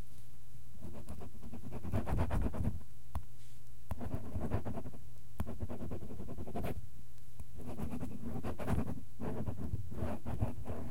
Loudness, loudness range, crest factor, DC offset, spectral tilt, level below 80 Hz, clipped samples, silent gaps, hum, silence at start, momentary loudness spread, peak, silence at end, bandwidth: -43 LUFS; 4 LU; 20 dB; 2%; -8 dB/octave; -48 dBFS; under 0.1%; none; none; 0 s; 19 LU; -18 dBFS; 0 s; 16.5 kHz